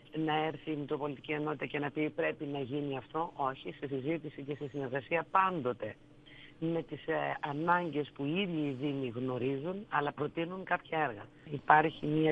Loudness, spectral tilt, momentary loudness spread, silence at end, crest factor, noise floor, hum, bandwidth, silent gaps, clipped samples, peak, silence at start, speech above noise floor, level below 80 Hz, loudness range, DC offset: -34 LUFS; -8.5 dB/octave; 10 LU; 0 s; 26 dB; -55 dBFS; none; 5.4 kHz; none; under 0.1%; -8 dBFS; 0.1 s; 21 dB; -68 dBFS; 4 LU; under 0.1%